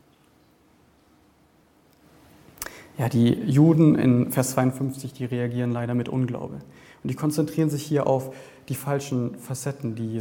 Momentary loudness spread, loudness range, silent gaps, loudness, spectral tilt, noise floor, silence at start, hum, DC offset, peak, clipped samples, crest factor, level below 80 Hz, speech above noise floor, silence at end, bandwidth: 18 LU; 6 LU; none; -24 LUFS; -7 dB/octave; -59 dBFS; 2.6 s; none; under 0.1%; -6 dBFS; under 0.1%; 18 dB; -60 dBFS; 36 dB; 0 s; 17.5 kHz